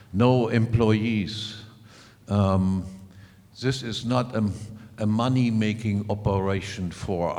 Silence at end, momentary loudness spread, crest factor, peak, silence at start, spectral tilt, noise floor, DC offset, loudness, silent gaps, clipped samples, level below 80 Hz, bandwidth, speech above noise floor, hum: 0 s; 11 LU; 18 dB; -6 dBFS; 0.1 s; -7 dB/octave; -50 dBFS; under 0.1%; -25 LUFS; none; under 0.1%; -50 dBFS; 11.5 kHz; 26 dB; none